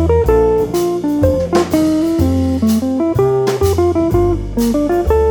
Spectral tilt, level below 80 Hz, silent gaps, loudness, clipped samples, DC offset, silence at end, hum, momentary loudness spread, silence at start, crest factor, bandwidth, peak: -7 dB/octave; -26 dBFS; none; -14 LUFS; under 0.1%; under 0.1%; 0 s; none; 4 LU; 0 s; 12 dB; over 20 kHz; 0 dBFS